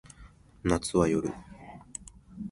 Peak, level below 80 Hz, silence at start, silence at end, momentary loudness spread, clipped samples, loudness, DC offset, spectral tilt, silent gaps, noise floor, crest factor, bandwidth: -10 dBFS; -48 dBFS; 0.2 s; 0 s; 22 LU; under 0.1%; -29 LUFS; under 0.1%; -5.5 dB/octave; none; -54 dBFS; 22 dB; 11.5 kHz